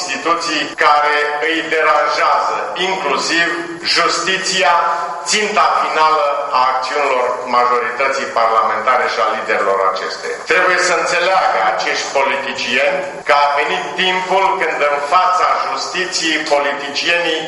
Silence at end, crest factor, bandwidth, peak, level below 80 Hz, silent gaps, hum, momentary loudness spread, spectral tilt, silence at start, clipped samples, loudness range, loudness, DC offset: 0 s; 16 dB; 11.5 kHz; 0 dBFS; -60 dBFS; none; none; 5 LU; -1.5 dB/octave; 0 s; under 0.1%; 1 LU; -14 LUFS; under 0.1%